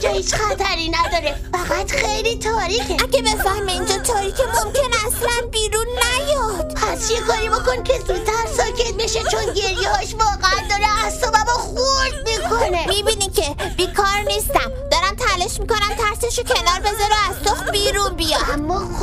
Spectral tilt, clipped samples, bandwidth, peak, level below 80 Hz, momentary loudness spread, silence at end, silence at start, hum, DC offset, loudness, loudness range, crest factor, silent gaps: -2.5 dB/octave; under 0.1%; 16 kHz; -2 dBFS; -28 dBFS; 4 LU; 0 s; 0 s; none; under 0.1%; -18 LUFS; 1 LU; 16 dB; none